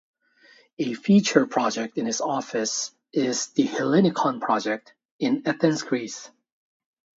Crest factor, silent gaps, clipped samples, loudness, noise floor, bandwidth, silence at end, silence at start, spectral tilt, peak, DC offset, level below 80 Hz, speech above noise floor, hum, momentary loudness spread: 22 dB; 5.05-5.19 s; under 0.1%; -24 LUFS; -57 dBFS; 8 kHz; 0.9 s; 0.8 s; -4.5 dB/octave; -2 dBFS; under 0.1%; -72 dBFS; 33 dB; none; 10 LU